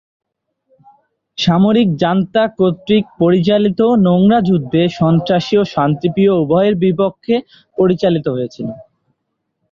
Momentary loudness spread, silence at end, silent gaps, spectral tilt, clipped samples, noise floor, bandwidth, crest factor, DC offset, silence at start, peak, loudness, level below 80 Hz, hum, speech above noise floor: 7 LU; 0.9 s; none; -8 dB/octave; under 0.1%; -72 dBFS; 7.2 kHz; 12 dB; under 0.1%; 1.4 s; -2 dBFS; -14 LUFS; -50 dBFS; none; 59 dB